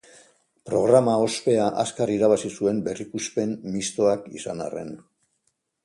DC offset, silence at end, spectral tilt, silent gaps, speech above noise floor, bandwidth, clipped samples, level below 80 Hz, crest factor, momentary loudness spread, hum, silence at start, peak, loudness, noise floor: under 0.1%; 0.85 s; -5 dB/octave; none; 50 dB; 11.5 kHz; under 0.1%; -62 dBFS; 20 dB; 14 LU; none; 0.65 s; -4 dBFS; -23 LUFS; -73 dBFS